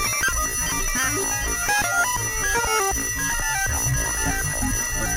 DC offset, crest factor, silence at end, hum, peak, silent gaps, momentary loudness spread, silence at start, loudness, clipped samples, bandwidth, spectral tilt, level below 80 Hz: under 0.1%; 14 dB; 0 s; none; -10 dBFS; none; 3 LU; 0 s; -21 LUFS; under 0.1%; 16 kHz; -2 dB/octave; -32 dBFS